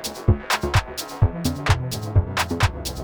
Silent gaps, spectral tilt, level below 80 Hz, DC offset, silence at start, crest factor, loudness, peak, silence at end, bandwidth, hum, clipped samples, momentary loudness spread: none; -5 dB/octave; -30 dBFS; under 0.1%; 0 s; 18 dB; -23 LUFS; -4 dBFS; 0 s; over 20 kHz; none; under 0.1%; 3 LU